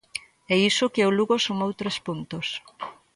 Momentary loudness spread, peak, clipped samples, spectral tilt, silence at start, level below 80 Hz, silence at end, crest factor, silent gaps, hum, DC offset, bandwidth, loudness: 16 LU; -8 dBFS; under 0.1%; -4 dB/octave; 0.15 s; -64 dBFS; 0.2 s; 16 dB; none; none; under 0.1%; 11.5 kHz; -24 LUFS